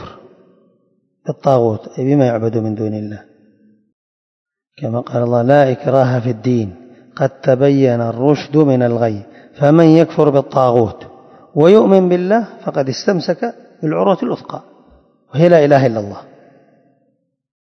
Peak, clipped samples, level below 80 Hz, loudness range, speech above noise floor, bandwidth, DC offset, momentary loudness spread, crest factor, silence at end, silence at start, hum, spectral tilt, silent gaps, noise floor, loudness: 0 dBFS; 0.3%; -58 dBFS; 6 LU; 50 dB; 6.6 kHz; under 0.1%; 15 LU; 14 dB; 1.55 s; 0 s; none; -8 dB/octave; 3.93-4.46 s; -64 dBFS; -14 LUFS